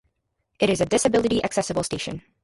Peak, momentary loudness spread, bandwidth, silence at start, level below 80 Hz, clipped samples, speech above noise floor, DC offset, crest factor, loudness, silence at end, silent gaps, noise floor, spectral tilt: -8 dBFS; 9 LU; 11.5 kHz; 0.6 s; -50 dBFS; under 0.1%; 52 dB; under 0.1%; 16 dB; -23 LUFS; 0.25 s; none; -75 dBFS; -4 dB/octave